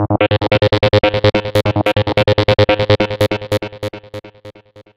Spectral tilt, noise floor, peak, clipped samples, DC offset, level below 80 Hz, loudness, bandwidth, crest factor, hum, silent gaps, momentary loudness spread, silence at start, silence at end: -6.5 dB/octave; -40 dBFS; 0 dBFS; under 0.1%; 0.6%; -36 dBFS; -14 LUFS; 15.5 kHz; 14 dB; none; none; 14 LU; 0 s; 0.15 s